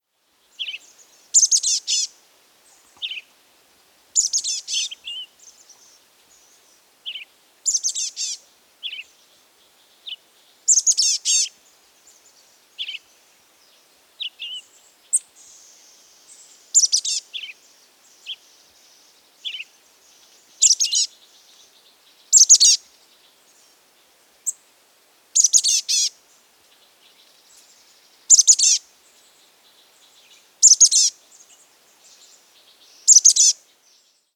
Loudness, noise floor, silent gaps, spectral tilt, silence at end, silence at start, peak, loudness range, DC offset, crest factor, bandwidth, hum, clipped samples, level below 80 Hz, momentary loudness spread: -15 LUFS; -64 dBFS; none; 7 dB/octave; 0.8 s; 0.6 s; 0 dBFS; 14 LU; under 0.1%; 22 dB; over 20 kHz; none; under 0.1%; -86 dBFS; 25 LU